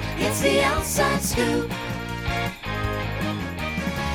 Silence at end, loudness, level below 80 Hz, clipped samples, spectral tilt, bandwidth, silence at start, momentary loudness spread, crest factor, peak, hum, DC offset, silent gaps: 0 s; -24 LUFS; -36 dBFS; under 0.1%; -4 dB/octave; over 20 kHz; 0 s; 8 LU; 18 dB; -8 dBFS; none; under 0.1%; none